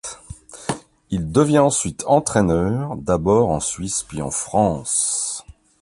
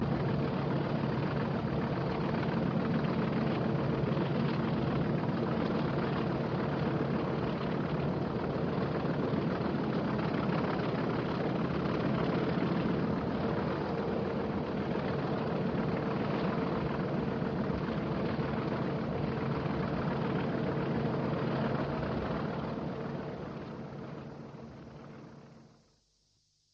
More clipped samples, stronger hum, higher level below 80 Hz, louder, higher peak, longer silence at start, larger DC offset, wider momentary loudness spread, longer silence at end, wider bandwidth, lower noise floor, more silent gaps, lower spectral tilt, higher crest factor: neither; neither; first, -42 dBFS vs -52 dBFS; first, -20 LUFS vs -33 LUFS; first, -2 dBFS vs -20 dBFS; about the same, 0.05 s vs 0 s; neither; first, 14 LU vs 6 LU; second, 0.3 s vs 1.1 s; first, 11.5 kHz vs 6.8 kHz; second, -39 dBFS vs -73 dBFS; neither; second, -5 dB/octave vs -9 dB/octave; about the same, 18 dB vs 14 dB